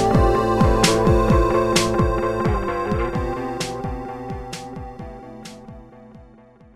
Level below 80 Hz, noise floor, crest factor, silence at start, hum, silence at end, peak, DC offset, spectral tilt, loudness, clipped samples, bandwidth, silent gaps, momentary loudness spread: -28 dBFS; -48 dBFS; 20 dB; 0 s; none; 0.55 s; -2 dBFS; under 0.1%; -5.5 dB/octave; -20 LUFS; under 0.1%; 15 kHz; none; 20 LU